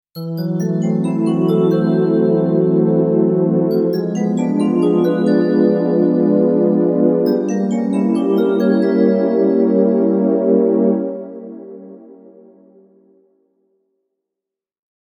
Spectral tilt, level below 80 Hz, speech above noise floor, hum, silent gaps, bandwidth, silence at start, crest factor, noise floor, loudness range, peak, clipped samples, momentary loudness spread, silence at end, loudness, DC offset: -9 dB/octave; -74 dBFS; 69 dB; none; none; 15.5 kHz; 0.15 s; 16 dB; -84 dBFS; 4 LU; 0 dBFS; under 0.1%; 6 LU; 3.05 s; -15 LUFS; under 0.1%